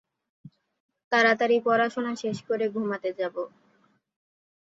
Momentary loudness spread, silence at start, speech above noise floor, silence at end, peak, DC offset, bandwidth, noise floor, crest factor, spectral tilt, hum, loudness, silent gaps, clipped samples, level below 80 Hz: 11 LU; 0.45 s; 41 dB; 1.25 s; -8 dBFS; under 0.1%; 7.8 kHz; -66 dBFS; 20 dB; -5 dB/octave; none; -26 LUFS; 0.80-0.89 s, 1.04-1.11 s; under 0.1%; -76 dBFS